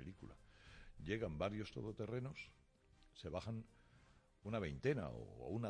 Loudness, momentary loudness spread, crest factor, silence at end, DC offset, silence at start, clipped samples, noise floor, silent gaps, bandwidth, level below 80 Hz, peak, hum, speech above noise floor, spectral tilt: -46 LUFS; 21 LU; 20 dB; 0 s; under 0.1%; 0 s; under 0.1%; -71 dBFS; none; 10 kHz; -64 dBFS; -26 dBFS; none; 26 dB; -7 dB/octave